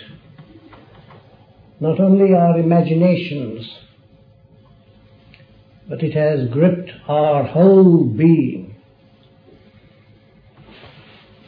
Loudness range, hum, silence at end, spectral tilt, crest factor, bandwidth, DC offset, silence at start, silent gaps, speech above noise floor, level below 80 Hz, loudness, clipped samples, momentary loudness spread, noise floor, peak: 9 LU; none; 2.75 s; -12 dB/octave; 16 dB; 4.9 kHz; under 0.1%; 1.8 s; none; 36 dB; -58 dBFS; -15 LUFS; under 0.1%; 15 LU; -50 dBFS; -2 dBFS